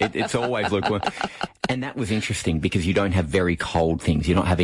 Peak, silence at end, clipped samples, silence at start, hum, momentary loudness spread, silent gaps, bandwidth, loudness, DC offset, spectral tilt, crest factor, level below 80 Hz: -8 dBFS; 0 s; under 0.1%; 0 s; none; 6 LU; none; 11.5 kHz; -23 LUFS; under 0.1%; -5.5 dB/octave; 16 dB; -42 dBFS